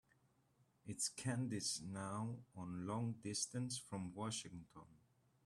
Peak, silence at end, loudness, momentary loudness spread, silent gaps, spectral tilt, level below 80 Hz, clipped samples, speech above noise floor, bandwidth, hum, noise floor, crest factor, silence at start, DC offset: -28 dBFS; 0.5 s; -45 LUFS; 13 LU; none; -4 dB/octave; -78 dBFS; under 0.1%; 32 dB; 13.5 kHz; none; -77 dBFS; 18 dB; 0.85 s; under 0.1%